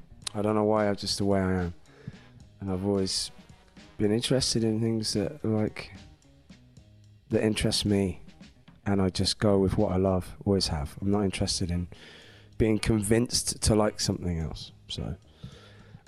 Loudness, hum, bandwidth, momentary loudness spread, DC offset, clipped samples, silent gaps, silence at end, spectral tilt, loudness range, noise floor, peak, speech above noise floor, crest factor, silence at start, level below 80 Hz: -27 LUFS; none; 15 kHz; 17 LU; under 0.1%; under 0.1%; none; 0.3 s; -5 dB/octave; 3 LU; -55 dBFS; -10 dBFS; 28 dB; 20 dB; 0.1 s; -46 dBFS